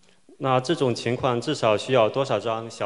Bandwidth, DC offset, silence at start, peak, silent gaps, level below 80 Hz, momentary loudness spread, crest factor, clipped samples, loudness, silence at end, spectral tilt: 11.5 kHz; 0.1%; 0.4 s; -6 dBFS; none; -62 dBFS; 5 LU; 18 dB; under 0.1%; -23 LUFS; 0 s; -5.5 dB/octave